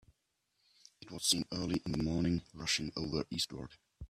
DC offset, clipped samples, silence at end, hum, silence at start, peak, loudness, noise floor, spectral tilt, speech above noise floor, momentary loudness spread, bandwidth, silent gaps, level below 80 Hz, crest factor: under 0.1%; under 0.1%; 0.05 s; none; 1 s; -16 dBFS; -35 LUFS; -81 dBFS; -3.5 dB/octave; 45 dB; 9 LU; 14 kHz; none; -58 dBFS; 22 dB